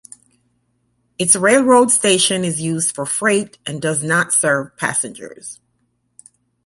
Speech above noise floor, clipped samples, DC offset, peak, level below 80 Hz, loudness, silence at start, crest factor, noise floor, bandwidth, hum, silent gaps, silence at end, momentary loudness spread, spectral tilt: 49 dB; under 0.1%; under 0.1%; 0 dBFS; -62 dBFS; -15 LUFS; 1.2 s; 18 dB; -66 dBFS; 12 kHz; 60 Hz at -50 dBFS; none; 1.1 s; 15 LU; -2.5 dB/octave